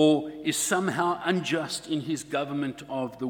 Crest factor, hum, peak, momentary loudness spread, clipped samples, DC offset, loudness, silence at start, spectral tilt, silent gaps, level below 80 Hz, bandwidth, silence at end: 18 dB; none; -8 dBFS; 7 LU; under 0.1%; under 0.1%; -28 LUFS; 0 s; -4 dB/octave; none; -66 dBFS; 18 kHz; 0 s